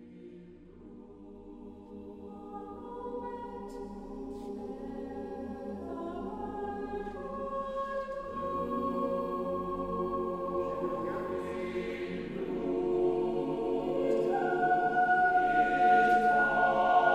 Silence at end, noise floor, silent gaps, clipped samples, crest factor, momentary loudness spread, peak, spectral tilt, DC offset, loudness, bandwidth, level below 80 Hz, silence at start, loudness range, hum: 0 s; -51 dBFS; none; under 0.1%; 18 dB; 21 LU; -14 dBFS; -6.5 dB/octave; under 0.1%; -31 LUFS; 9.4 kHz; -56 dBFS; 0 s; 16 LU; none